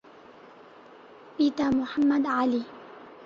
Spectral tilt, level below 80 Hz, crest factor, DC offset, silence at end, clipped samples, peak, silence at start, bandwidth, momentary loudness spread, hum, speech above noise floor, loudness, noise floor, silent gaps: -6 dB/octave; -62 dBFS; 16 dB; under 0.1%; 0 s; under 0.1%; -14 dBFS; 1.25 s; 7.2 kHz; 20 LU; none; 26 dB; -26 LUFS; -50 dBFS; none